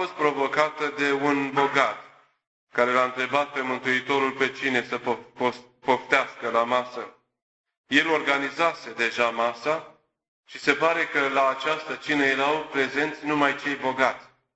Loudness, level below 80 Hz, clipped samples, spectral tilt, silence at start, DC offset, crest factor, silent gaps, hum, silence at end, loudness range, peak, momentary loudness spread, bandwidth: -24 LUFS; -68 dBFS; under 0.1%; -4 dB/octave; 0 s; under 0.1%; 22 dB; 2.47-2.67 s, 7.42-7.64 s, 7.77-7.84 s, 10.28-10.43 s; none; 0.3 s; 1 LU; -4 dBFS; 7 LU; 8.2 kHz